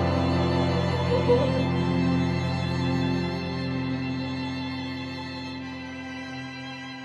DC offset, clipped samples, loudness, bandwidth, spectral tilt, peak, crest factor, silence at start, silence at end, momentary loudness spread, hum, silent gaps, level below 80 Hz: under 0.1%; under 0.1%; -27 LUFS; 9.4 kHz; -7 dB/octave; -8 dBFS; 18 dB; 0 s; 0 s; 13 LU; none; none; -46 dBFS